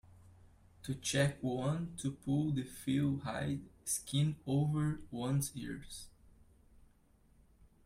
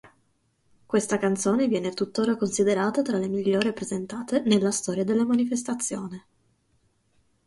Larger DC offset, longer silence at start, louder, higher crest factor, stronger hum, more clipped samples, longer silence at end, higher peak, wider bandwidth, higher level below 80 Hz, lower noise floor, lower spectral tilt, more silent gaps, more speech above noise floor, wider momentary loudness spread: neither; about the same, 0.05 s vs 0.05 s; second, -37 LUFS vs -25 LUFS; about the same, 18 dB vs 18 dB; neither; neither; first, 1.75 s vs 1.3 s; second, -20 dBFS vs -8 dBFS; first, 15.5 kHz vs 11.5 kHz; about the same, -62 dBFS vs -66 dBFS; about the same, -67 dBFS vs -69 dBFS; about the same, -5.5 dB/octave vs -5 dB/octave; neither; second, 32 dB vs 44 dB; first, 12 LU vs 8 LU